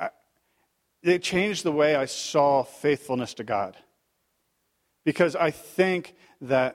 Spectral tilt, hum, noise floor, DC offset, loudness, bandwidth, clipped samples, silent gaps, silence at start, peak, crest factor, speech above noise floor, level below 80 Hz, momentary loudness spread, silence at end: -4.5 dB/octave; none; -74 dBFS; under 0.1%; -25 LUFS; 15.5 kHz; under 0.1%; none; 0 s; -6 dBFS; 20 dB; 49 dB; -64 dBFS; 8 LU; 0 s